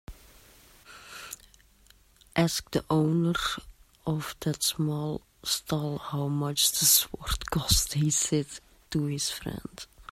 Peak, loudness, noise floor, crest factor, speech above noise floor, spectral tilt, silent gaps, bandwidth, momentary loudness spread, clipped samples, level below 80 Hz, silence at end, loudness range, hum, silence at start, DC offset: -8 dBFS; -27 LUFS; -60 dBFS; 22 dB; 31 dB; -3.5 dB/octave; none; 16 kHz; 19 LU; under 0.1%; -46 dBFS; 0.1 s; 6 LU; none; 0.1 s; under 0.1%